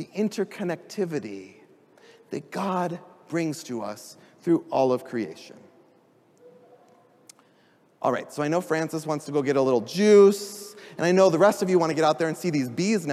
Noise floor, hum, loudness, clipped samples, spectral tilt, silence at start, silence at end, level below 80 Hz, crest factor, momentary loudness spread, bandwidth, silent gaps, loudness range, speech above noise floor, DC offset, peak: -61 dBFS; none; -24 LUFS; under 0.1%; -5.5 dB/octave; 0 s; 0 s; -78 dBFS; 20 dB; 18 LU; 15 kHz; none; 12 LU; 37 dB; under 0.1%; -6 dBFS